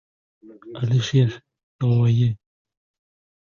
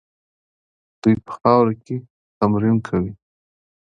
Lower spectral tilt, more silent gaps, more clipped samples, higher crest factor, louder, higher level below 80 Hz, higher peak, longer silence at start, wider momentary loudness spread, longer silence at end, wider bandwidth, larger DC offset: second, -7.5 dB/octave vs -9.5 dB/octave; second, 1.63-1.79 s vs 2.10-2.41 s; neither; about the same, 16 dB vs 20 dB; about the same, -21 LUFS vs -20 LUFS; about the same, -54 dBFS vs -50 dBFS; second, -6 dBFS vs 0 dBFS; second, 0.5 s vs 1.05 s; first, 18 LU vs 14 LU; first, 1.05 s vs 0.65 s; about the same, 7.2 kHz vs 7.6 kHz; neither